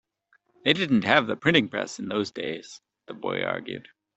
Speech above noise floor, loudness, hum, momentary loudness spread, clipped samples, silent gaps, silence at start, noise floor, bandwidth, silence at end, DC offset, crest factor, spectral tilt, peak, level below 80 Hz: 42 dB; -25 LUFS; none; 17 LU; under 0.1%; none; 0.65 s; -67 dBFS; 8.2 kHz; 0.35 s; under 0.1%; 24 dB; -5 dB/octave; -2 dBFS; -66 dBFS